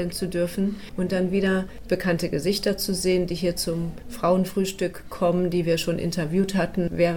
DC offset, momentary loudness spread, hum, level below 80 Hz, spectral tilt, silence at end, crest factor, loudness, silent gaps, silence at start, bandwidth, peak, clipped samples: 0.8%; 5 LU; none; -44 dBFS; -5.5 dB/octave; 0 s; 16 dB; -25 LUFS; none; 0 s; 18 kHz; -8 dBFS; under 0.1%